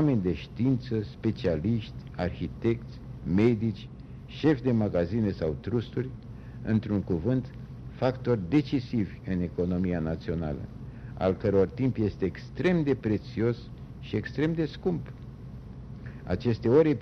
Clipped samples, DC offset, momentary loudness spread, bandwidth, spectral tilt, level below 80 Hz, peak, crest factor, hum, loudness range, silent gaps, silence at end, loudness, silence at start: under 0.1%; under 0.1%; 17 LU; 6.6 kHz; -9 dB/octave; -48 dBFS; -10 dBFS; 18 dB; none; 2 LU; none; 0 s; -29 LUFS; 0 s